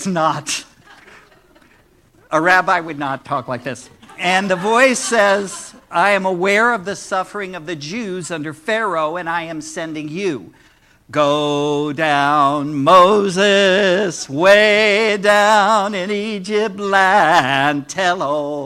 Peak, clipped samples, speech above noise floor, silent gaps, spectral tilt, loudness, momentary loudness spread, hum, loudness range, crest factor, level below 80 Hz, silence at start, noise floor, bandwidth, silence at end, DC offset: 0 dBFS; under 0.1%; 36 dB; none; -3.5 dB/octave; -16 LUFS; 14 LU; none; 9 LU; 16 dB; -58 dBFS; 0 s; -52 dBFS; 15.5 kHz; 0 s; under 0.1%